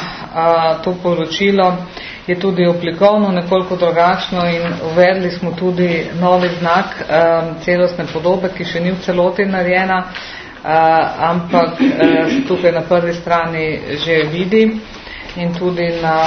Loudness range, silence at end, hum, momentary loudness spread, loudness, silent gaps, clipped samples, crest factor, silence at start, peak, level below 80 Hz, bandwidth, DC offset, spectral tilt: 2 LU; 0 s; none; 7 LU; -15 LUFS; none; under 0.1%; 14 dB; 0 s; 0 dBFS; -44 dBFS; 6.6 kHz; under 0.1%; -7 dB/octave